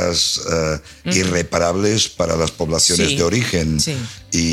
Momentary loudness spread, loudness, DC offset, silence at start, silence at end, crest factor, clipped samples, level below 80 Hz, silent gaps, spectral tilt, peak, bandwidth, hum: 6 LU; -17 LUFS; under 0.1%; 0 s; 0 s; 18 dB; under 0.1%; -36 dBFS; none; -3.5 dB/octave; 0 dBFS; 16 kHz; none